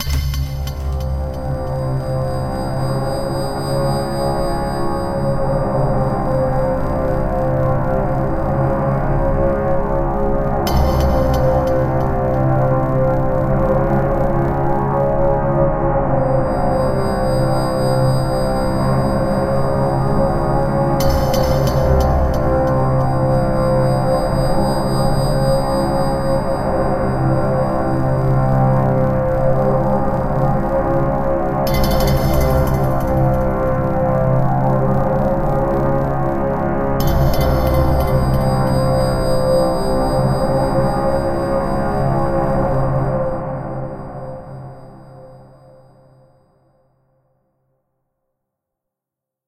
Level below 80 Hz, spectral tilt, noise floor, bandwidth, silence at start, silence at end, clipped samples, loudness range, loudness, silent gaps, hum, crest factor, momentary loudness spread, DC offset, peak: -24 dBFS; -7.5 dB/octave; -85 dBFS; 15 kHz; 0 s; 4.05 s; under 0.1%; 4 LU; -17 LUFS; none; none; 14 dB; 5 LU; under 0.1%; -2 dBFS